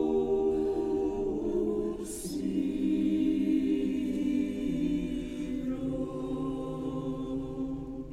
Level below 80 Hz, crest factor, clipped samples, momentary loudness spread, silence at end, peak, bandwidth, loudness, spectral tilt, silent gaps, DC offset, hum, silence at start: -48 dBFS; 12 dB; under 0.1%; 8 LU; 0 s; -18 dBFS; 14.5 kHz; -31 LUFS; -7 dB/octave; none; under 0.1%; none; 0 s